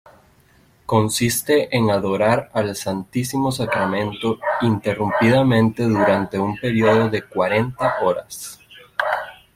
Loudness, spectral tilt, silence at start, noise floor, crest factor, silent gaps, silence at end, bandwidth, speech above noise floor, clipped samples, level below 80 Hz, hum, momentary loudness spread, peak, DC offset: -19 LUFS; -5.5 dB/octave; 0.9 s; -54 dBFS; 16 dB; none; 0.2 s; 16.5 kHz; 36 dB; under 0.1%; -52 dBFS; none; 8 LU; -2 dBFS; under 0.1%